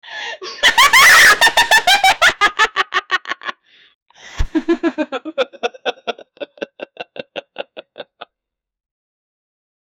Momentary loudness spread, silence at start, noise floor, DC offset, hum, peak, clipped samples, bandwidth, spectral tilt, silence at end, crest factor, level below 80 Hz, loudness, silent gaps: 24 LU; 0.05 s; -83 dBFS; under 0.1%; none; 0 dBFS; under 0.1%; over 20 kHz; -1 dB/octave; 1.75 s; 16 dB; -36 dBFS; -12 LUFS; 3.95-4.06 s